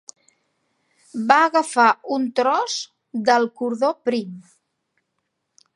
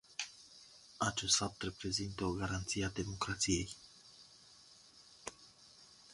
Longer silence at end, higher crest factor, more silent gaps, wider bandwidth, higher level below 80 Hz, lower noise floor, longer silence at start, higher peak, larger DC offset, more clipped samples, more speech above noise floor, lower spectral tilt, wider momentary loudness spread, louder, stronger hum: first, 1.35 s vs 0 s; about the same, 22 dB vs 24 dB; neither; about the same, 11.5 kHz vs 11.5 kHz; second, -74 dBFS vs -58 dBFS; first, -76 dBFS vs -62 dBFS; first, 1.15 s vs 0.1 s; first, 0 dBFS vs -16 dBFS; neither; neither; first, 56 dB vs 24 dB; about the same, -3.5 dB/octave vs -3 dB/octave; second, 12 LU vs 26 LU; first, -20 LUFS vs -37 LUFS; neither